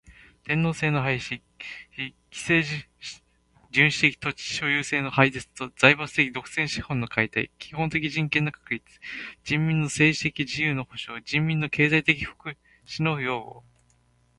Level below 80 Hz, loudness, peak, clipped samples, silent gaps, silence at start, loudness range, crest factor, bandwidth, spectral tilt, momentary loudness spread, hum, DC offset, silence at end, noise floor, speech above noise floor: -56 dBFS; -24 LUFS; 0 dBFS; under 0.1%; none; 0.1 s; 5 LU; 26 dB; 11.5 kHz; -5 dB/octave; 16 LU; none; under 0.1%; 0.8 s; -64 dBFS; 38 dB